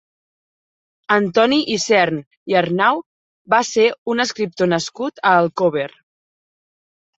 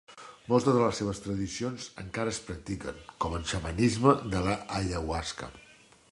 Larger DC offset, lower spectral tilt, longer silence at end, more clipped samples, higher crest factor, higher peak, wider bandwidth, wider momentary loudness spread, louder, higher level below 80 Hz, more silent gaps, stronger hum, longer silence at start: neither; second, -4 dB/octave vs -5.5 dB/octave; first, 1.3 s vs 0.5 s; neither; second, 18 dB vs 24 dB; first, -2 dBFS vs -6 dBFS; second, 8.2 kHz vs 11.5 kHz; second, 7 LU vs 15 LU; first, -17 LUFS vs -30 LUFS; second, -64 dBFS vs -46 dBFS; first, 2.27-2.31 s, 2.37-2.46 s, 3.06-3.45 s, 3.98-4.06 s vs none; neither; first, 1.1 s vs 0.1 s